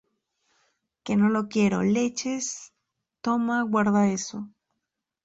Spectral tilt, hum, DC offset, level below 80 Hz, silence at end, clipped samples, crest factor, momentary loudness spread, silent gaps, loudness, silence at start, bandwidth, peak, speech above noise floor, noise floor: -5 dB/octave; none; under 0.1%; -64 dBFS; 0.75 s; under 0.1%; 16 dB; 15 LU; none; -25 LUFS; 1.05 s; 8 kHz; -10 dBFS; 59 dB; -83 dBFS